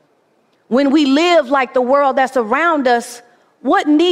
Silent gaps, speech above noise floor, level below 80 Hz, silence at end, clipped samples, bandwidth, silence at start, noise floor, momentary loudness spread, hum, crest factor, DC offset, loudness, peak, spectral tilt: none; 45 dB; -62 dBFS; 0 s; under 0.1%; 13.5 kHz; 0.7 s; -58 dBFS; 6 LU; none; 12 dB; under 0.1%; -14 LUFS; -2 dBFS; -3.5 dB/octave